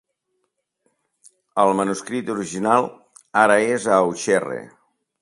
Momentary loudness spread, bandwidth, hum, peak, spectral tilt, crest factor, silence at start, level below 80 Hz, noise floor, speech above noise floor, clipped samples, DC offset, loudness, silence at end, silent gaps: 12 LU; 11.5 kHz; none; 0 dBFS; -4.5 dB/octave; 22 dB; 1.55 s; -66 dBFS; -74 dBFS; 55 dB; under 0.1%; under 0.1%; -20 LUFS; 0.55 s; none